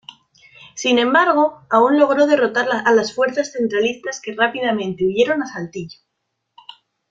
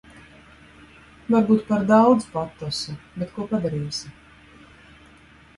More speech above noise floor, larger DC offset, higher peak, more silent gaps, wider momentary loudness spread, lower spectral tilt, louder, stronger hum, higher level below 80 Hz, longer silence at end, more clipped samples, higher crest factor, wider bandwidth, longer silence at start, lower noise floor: first, 58 dB vs 30 dB; neither; about the same, -2 dBFS vs -4 dBFS; neither; second, 13 LU vs 16 LU; second, -4 dB/octave vs -6 dB/octave; first, -17 LUFS vs -22 LUFS; neither; second, -62 dBFS vs -54 dBFS; second, 1.2 s vs 1.45 s; neither; about the same, 16 dB vs 20 dB; second, 7.8 kHz vs 11.5 kHz; second, 0.75 s vs 1.3 s; first, -75 dBFS vs -51 dBFS